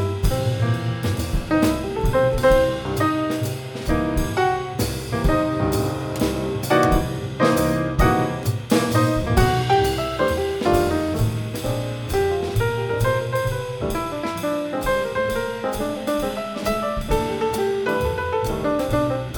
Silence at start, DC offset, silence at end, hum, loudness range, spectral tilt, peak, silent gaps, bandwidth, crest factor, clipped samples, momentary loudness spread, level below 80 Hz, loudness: 0 s; under 0.1%; 0 s; none; 4 LU; -6 dB/octave; -4 dBFS; none; 19.5 kHz; 18 dB; under 0.1%; 7 LU; -32 dBFS; -22 LUFS